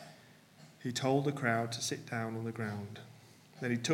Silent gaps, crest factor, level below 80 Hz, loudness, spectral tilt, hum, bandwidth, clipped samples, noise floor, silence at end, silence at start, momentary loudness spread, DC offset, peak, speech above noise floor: none; 20 dB; -80 dBFS; -36 LUFS; -4.5 dB/octave; none; 16.5 kHz; under 0.1%; -59 dBFS; 0 s; 0 s; 17 LU; under 0.1%; -16 dBFS; 25 dB